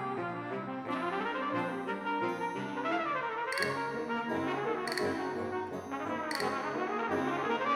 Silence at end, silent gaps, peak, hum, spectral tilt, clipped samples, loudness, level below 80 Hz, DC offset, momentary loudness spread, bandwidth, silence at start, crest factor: 0 s; none; -14 dBFS; none; -5 dB/octave; under 0.1%; -34 LUFS; -74 dBFS; under 0.1%; 5 LU; 18.5 kHz; 0 s; 20 dB